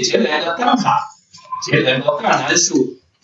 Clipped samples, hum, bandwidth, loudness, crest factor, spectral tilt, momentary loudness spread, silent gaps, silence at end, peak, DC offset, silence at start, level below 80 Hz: under 0.1%; none; 8.2 kHz; -16 LUFS; 16 dB; -3 dB/octave; 11 LU; none; 0.3 s; -2 dBFS; under 0.1%; 0 s; -68 dBFS